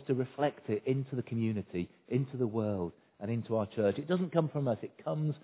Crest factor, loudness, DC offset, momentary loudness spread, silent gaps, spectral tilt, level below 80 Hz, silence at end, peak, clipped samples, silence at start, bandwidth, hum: 20 dB; -34 LUFS; under 0.1%; 7 LU; none; -8 dB/octave; -64 dBFS; 0.05 s; -14 dBFS; under 0.1%; 0 s; 4 kHz; none